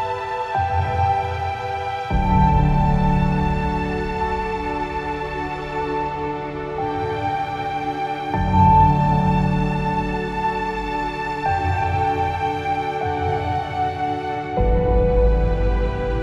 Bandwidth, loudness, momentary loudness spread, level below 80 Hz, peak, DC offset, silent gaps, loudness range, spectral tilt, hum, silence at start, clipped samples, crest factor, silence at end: 7.8 kHz; -21 LUFS; 8 LU; -26 dBFS; -4 dBFS; under 0.1%; none; 6 LU; -8 dB/octave; none; 0 s; under 0.1%; 16 dB; 0 s